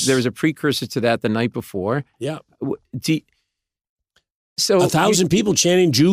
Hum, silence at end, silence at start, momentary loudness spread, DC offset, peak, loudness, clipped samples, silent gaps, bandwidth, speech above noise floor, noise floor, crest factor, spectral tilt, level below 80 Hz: none; 0 s; 0 s; 13 LU; under 0.1%; -4 dBFS; -19 LUFS; under 0.1%; 3.89-3.97 s, 4.35-4.56 s; 16 kHz; 60 dB; -79 dBFS; 16 dB; -4.5 dB/octave; -56 dBFS